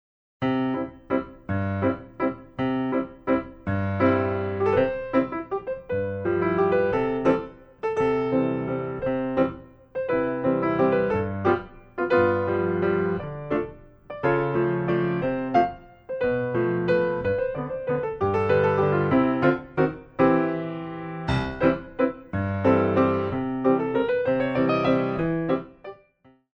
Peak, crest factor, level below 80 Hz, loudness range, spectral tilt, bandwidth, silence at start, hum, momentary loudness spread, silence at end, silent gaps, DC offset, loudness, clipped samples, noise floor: -6 dBFS; 18 dB; -50 dBFS; 3 LU; -9 dB/octave; 6.4 kHz; 0.4 s; none; 9 LU; 0.65 s; none; under 0.1%; -25 LUFS; under 0.1%; -59 dBFS